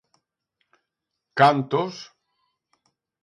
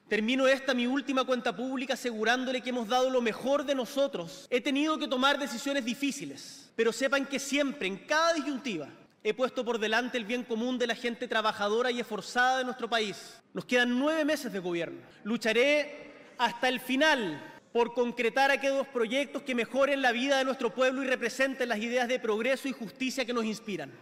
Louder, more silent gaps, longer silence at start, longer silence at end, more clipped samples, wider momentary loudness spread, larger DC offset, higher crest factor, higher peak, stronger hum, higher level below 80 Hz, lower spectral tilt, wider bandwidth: first, -21 LUFS vs -29 LUFS; neither; first, 1.35 s vs 0.1 s; first, 1.2 s vs 0 s; neither; first, 22 LU vs 10 LU; neither; first, 24 dB vs 18 dB; first, -2 dBFS vs -12 dBFS; neither; about the same, -76 dBFS vs -74 dBFS; first, -6 dB/octave vs -3 dB/octave; second, 11.5 kHz vs 16 kHz